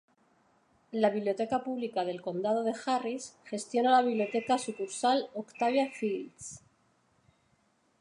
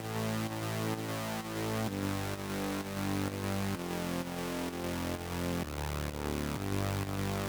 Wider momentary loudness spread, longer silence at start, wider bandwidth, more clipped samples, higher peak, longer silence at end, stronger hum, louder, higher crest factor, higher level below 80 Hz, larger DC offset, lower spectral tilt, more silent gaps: first, 14 LU vs 2 LU; first, 0.9 s vs 0 s; second, 11.5 kHz vs over 20 kHz; neither; first, -12 dBFS vs -18 dBFS; first, 1.45 s vs 0 s; neither; first, -31 LUFS vs -36 LUFS; about the same, 20 dB vs 18 dB; second, -76 dBFS vs -50 dBFS; neither; about the same, -4 dB/octave vs -5 dB/octave; neither